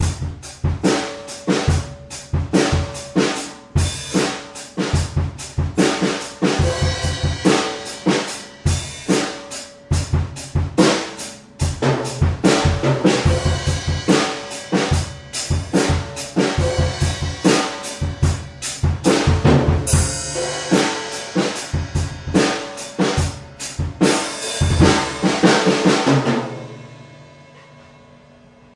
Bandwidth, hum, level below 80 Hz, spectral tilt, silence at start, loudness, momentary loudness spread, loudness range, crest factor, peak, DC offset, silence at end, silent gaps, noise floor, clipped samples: 11.5 kHz; none; -34 dBFS; -5 dB/octave; 0 s; -19 LUFS; 11 LU; 4 LU; 18 dB; 0 dBFS; under 0.1%; 0.95 s; none; -47 dBFS; under 0.1%